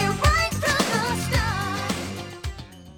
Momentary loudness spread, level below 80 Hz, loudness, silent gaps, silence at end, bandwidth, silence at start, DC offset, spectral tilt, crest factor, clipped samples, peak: 15 LU; -32 dBFS; -23 LUFS; none; 0 s; 19.5 kHz; 0 s; under 0.1%; -4 dB/octave; 18 dB; under 0.1%; -6 dBFS